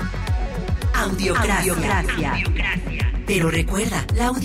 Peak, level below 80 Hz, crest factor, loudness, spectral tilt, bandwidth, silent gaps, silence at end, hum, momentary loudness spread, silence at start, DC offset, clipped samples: -10 dBFS; -26 dBFS; 12 dB; -21 LUFS; -5 dB/octave; 16 kHz; none; 0 s; none; 6 LU; 0 s; under 0.1%; under 0.1%